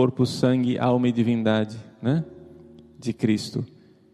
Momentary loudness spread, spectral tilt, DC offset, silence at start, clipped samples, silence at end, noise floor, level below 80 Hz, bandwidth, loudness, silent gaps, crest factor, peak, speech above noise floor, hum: 12 LU; -7 dB/octave; under 0.1%; 0 s; under 0.1%; 0.5 s; -48 dBFS; -60 dBFS; 12.5 kHz; -24 LUFS; none; 16 dB; -8 dBFS; 25 dB; none